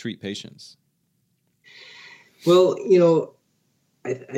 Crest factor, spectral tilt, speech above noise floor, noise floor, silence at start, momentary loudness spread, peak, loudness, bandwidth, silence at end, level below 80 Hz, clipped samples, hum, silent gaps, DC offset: 18 dB; -6.5 dB/octave; 50 dB; -70 dBFS; 0.05 s; 25 LU; -6 dBFS; -20 LUFS; 13 kHz; 0 s; -80 dBFS; under 0.1%; none; none; under 0.1%